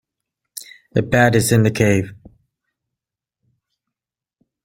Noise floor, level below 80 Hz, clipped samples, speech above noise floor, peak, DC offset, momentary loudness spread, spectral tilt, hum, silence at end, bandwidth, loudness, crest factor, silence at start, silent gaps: -88 dBFS; -48 dBFS; under 0.1%; 73 dB; -2 dBFS; under 0.1%; 21 LU; -5.5 dB/octave; none; 2.5 s; 16.5 kHz; -16 LUFS; 20 dB; 0.55 s; none